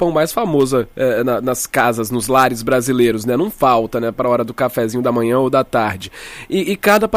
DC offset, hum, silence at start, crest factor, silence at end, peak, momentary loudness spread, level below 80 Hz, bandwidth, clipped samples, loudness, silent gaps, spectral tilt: under 0.1%; none; 0 s; 16 dB; 0 s; 0 dBFS; 6 LU; -44 dBFS; 15.5 kHz; under 0.1%; -16 LUFS; none; -5 dB/octave